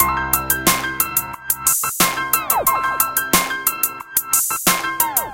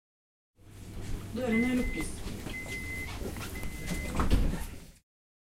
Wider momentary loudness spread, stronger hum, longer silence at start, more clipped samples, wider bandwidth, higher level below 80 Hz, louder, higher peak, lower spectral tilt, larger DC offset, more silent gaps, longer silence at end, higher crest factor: second, 3 LU vs 15 LU; neither; second, 0 s vs 0.65 s; neither; about the same, 17.5 kHz vs 16 kHz; about the same, -42 dBFS vs -38 dBFS; first, -17 LUFS vs -34 LUFS; first, 0 dBFS vs -12 dBFS; second, -1 dB/octave vs -5.5 dB/octave; neither; neither; second, 0 s vs 0.5 s; about the same, 18 dB vs 22 dB